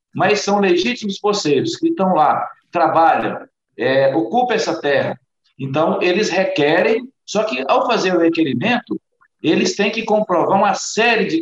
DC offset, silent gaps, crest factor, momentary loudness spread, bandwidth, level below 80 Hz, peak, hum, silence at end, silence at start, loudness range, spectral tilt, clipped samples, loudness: under 0.1%; none; 14 dB; 8 LU; 8.2 kHz; -62 dBFS; -4 dBFS; none; 0 s; 0.15 s; 1 LU; -4.5 dB/octave; under 0.1%; -17 LUFS